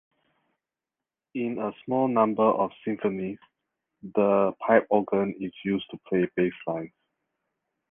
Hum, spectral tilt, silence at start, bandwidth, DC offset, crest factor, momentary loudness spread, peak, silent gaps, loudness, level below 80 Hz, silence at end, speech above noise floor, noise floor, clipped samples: none; -10 dB/octave; 1.35 s; 3.7 kHz; under 0.1%; 22 dB; 12 LU; -6 dBFS; none; -26 LUFS; -66 dBFS; 1.05 s; 64 dB; -90 dBFS; under 0.1%